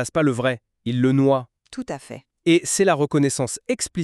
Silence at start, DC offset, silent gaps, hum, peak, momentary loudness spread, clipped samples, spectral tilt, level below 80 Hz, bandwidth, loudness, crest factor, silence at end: 0 s; under 0.1%; none; none; -6 dBFS; 15 LU; under 0.1%; -5 dB/octave; -58 dBFS; 13.5 kHz; -21 LUFS; 16 dB; 0 s